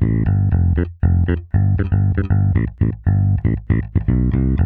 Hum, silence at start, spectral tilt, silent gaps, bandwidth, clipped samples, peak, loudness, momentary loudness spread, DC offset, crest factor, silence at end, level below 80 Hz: none; 0 s; -13 dB/octave; none; 3.3 kHz; under 0.1%; -4 dBFS; -18 LUFS; 3 LU; under 0.1%; 12 dB; 0 s; -26 dBFS